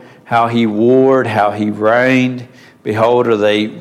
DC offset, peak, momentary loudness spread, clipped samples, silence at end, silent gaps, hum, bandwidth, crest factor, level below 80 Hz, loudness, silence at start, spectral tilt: under 0.1%; -2 dBFS; 8 LU; under 0.1%; 0 s; none; none; 12 kHz; 12 dB; -60 dBFS; -13 LUFS; 0.3 s; -7 dB/octave